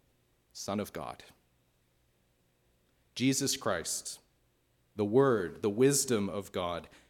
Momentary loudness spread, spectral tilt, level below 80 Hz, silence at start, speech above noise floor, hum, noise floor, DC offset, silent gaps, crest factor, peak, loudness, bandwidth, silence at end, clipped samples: 19 LU; -4 dB/octave; -70 dBFS; 0.55 s; 41 dB; none; -72 dBFS; under 0.1%; none; 20 dB; -14 dBFS; -31 LUFS; 18 kHz; 0.2 s; under 0.1%